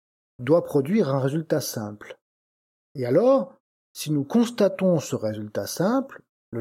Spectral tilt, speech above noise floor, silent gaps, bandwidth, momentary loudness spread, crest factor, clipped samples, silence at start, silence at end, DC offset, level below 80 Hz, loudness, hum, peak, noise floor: -6.5 dB/octave; over 67 dB; 2.21-2.95 s, 3.60-3.95 s, 6.29-6.52 s; 16.5 kHz; 16 LU; 18 dB; under 0.1%; 0.4 s; 0 s; under 0.1%; -72 dBFS; -24 LUFS; none; -8 dBFS; under -90 dBFS